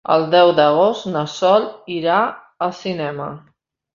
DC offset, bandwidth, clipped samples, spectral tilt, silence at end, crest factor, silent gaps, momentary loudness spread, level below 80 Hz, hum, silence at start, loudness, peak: under 0.1%; 7.4 kHz; under 0.1%; -5.5 dB/octave; 0.55 s; 16 dB; none; 13 LU; -62 dBFS; none; 0.1 s; -17 LUFS; -2 dBFS